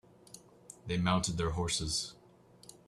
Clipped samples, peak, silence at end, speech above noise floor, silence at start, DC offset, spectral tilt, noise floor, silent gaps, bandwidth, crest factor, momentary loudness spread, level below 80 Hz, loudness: under 0.1%; -14 dBFS; 0.15 s; 27 dB; 0.3 s; under 0.1%; -4 dB/octave; -60 dBFS; none; 13.5 kHz; 22 dB; 23 LU; -52 dBFS; -33 LUFS